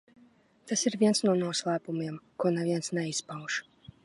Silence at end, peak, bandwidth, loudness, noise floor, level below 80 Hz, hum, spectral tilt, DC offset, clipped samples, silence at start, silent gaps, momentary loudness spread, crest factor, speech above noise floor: 0.45 s; -14 dBFS; 11.5 kHz; -30 LUFS; -61 dBFS; -74 dBFS; none; -4 dB/octave; under 0.1%; under 0.1%; 0.65 s; none; 10 LU; 18 dB; 32 dB